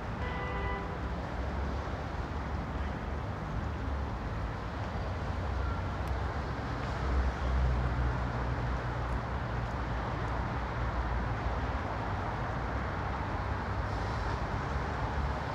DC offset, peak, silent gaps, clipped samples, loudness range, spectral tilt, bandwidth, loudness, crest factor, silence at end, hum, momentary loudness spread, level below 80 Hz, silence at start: under 0.1%; -18 dBFS; none; under 0.1%; 3 LU; -7 dB/octave; 8 kHz; -35 LUFS; 14 dB; 0 s; none; 5 LU; -38 dBFS; 0 s